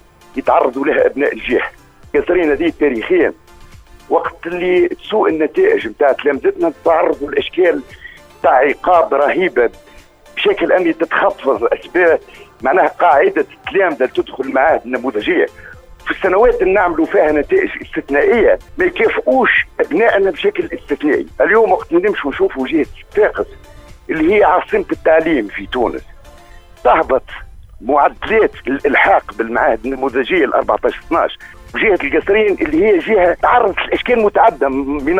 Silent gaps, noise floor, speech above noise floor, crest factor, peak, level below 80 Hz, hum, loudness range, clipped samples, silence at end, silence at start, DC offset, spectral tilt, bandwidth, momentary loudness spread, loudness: none; -42 dBFS; 28 dB; 14 dB; 0 dBFS; -40 dBFS; none; 3 LU; under 0.1%; 0 s; 0.35 s; under 0.1%; -6 dB/octave; 9.8 kHz; 8 LU; -14 LUFS